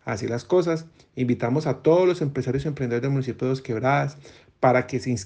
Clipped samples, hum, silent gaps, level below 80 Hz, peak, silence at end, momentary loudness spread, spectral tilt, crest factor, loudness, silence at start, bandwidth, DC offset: under 0.1%; none; none; -56 dBFS; -6 dBFS; 0 s; 8 LU; -7 dB/octave; 18 dB; -24 LUFS; 0.05 s; 9.4 kHz; under 0.1%